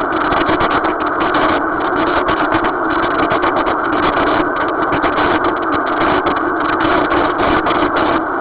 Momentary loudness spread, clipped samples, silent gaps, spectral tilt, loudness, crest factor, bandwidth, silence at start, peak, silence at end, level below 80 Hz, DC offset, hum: 2 LU; under 0.1%; none; -9 dB/octave; -15 LUFS; 14 dB; 4 kHz; 0 s; 0 dBFS; 0 s; -36 dBFS; under 0.1%; none